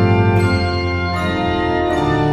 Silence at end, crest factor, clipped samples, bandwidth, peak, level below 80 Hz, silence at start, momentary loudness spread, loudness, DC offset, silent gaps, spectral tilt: 0 s; 14 dB; under 0.1%; 11 kHz; -2 dBFS; -32 dBFS; 0 s; 5 LU; -17 LUFS; under 0.1%; none; -7.5 dB/octave